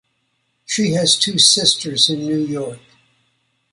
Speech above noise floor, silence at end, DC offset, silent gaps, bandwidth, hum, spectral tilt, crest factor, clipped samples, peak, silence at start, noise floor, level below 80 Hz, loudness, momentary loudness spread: 51 dB; 0.95 s; under 0.1%; none; 11.5 kHz; none; -2.5 dB/octave; 20 dB; under 0.1%; 0 dBFS; 0.7 s; -68 dBFS; -60 dBFS; -15 LUFS; 13 LU